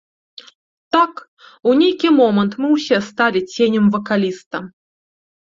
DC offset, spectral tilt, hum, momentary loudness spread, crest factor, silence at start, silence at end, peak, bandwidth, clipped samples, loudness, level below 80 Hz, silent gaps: under 0.1%; -6 dB/octave; none; 10 LU; 16 dB; 0.95 s; 0.9 s; -2 dBFS; 7.6 kHz; under 0.1%; -16 LUFS; -62 dBFS; 1.28-1.37 s, 4.46-4.51 s